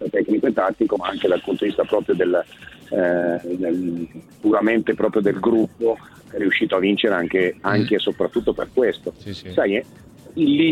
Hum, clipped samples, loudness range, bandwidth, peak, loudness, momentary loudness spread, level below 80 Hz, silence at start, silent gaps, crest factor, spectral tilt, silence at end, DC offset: none; under 0.1%; 2 LU; 12 kHz; -4 dBFS; -21 LUFS; 9 LU; -54 dBFS; 0 s; none; 18 dB; -7 dB/octave; 0 s; under 0.1%